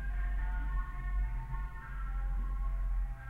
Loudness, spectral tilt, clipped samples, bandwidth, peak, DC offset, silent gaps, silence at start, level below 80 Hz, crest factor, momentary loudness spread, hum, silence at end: -39 LUFS; -7.5 dB/octave; under 0.1%; 3.2 kHz; -24 dBFS; under 0.1%; none; 0 s; -34 dBFS; 10 dB; 4 LU; none; 0 s